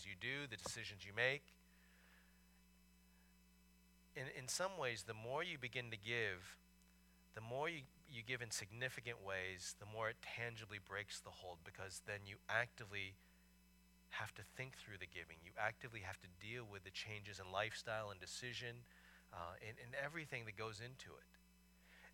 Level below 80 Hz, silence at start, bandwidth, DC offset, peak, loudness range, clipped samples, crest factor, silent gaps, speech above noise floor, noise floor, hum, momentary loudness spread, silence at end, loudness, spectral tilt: -74 dBFS; 0 s; 18 kHz; under 0.1%; -24 dBFS; 5 LU; under 0.1%; 26 dB; none; 22 dB; -71 dBFS; none; 13 LU; 0 s; -48 LUFS; -3 dB/octave